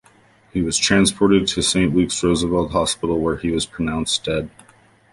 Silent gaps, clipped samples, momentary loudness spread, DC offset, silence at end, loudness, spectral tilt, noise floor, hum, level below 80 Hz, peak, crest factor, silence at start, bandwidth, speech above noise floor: none; under 0.1%; 9 LU; under 0.1%; 0.65 s; -19 LUFS; -4 dB/octave; -53 dBFS; none; -40 dBFS; -2 dBFS; 18 dB; 0.55 s; 11.5 kHz; 34 dB